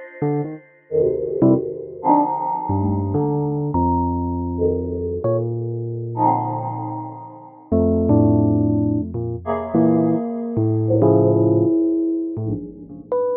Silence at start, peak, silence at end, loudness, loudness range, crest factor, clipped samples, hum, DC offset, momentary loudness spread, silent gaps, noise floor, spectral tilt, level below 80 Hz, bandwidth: 0 s; -2 dBFS; 0 s; -20 LUFS; 4 LU; 16 dB; under 0.1%; none; under 0.1%; 11 LU; none; -39 dBFS; -15.5 dB/octave; -38 dBFS; 2.3 kHz